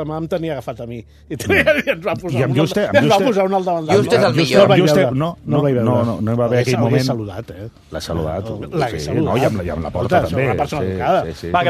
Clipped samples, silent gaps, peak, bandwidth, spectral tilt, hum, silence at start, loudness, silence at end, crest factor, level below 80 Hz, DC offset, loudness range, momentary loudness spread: under 0.1%; none; 0 dBFS; 14 kHz; -6 dB/octave; none; 0 s; -17 LUFS; 0 s; 16 dB; -44 dBFS; under 0.1%; 6 LU; 14 LU